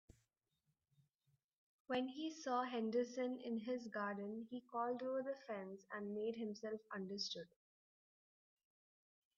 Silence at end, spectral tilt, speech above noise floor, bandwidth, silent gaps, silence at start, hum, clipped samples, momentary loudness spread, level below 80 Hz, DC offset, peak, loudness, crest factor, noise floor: 1.9 s; -3.5 dB/octave; 43 dB; 7.2 kHz; none; 1.9 s; none; under 0.1%; 8 LU; -88 dBFS; under 0.1%; -28 dBFS; -45 LUFS; 18 dB; -88 dBFS